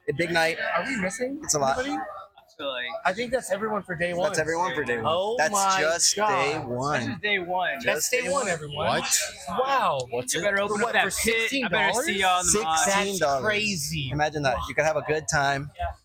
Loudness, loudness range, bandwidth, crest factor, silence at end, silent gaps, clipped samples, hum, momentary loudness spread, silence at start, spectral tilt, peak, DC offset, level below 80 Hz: -24 LUFS; 5 LU; 17.5 kHz; 20 dB; 0.1 s; none; under 0.1%; none; 7 LU; 0.05 s; -2.5 dB/octave; -6 dBFS; under 0.1%; -50 dBFS